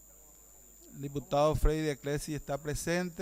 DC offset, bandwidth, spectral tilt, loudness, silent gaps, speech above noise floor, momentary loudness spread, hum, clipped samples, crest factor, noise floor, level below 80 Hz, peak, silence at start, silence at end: under 0.1%; 16 kHz; -5.5 dB/octave; -33 LUFS; none; 25 dB; 14 LU; none; under 0.1%; 20 dB; -57 dBFS; -40 dBFS; -14 dBFS; 0.8 s; 0 s